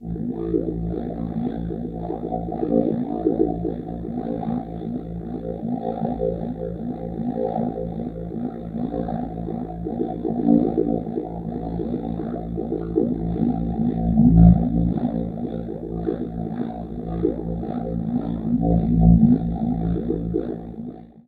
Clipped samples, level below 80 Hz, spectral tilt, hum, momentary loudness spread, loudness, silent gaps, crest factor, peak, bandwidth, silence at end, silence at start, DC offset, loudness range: under 0.1%; -32 dBFS; -12.5 dB/octave; none; 12 LU; -23 LUFS; none; 22 dB; 0 dBFS; 4 kHz; 0.05 s; 0 s; under 0.1%; 8 LU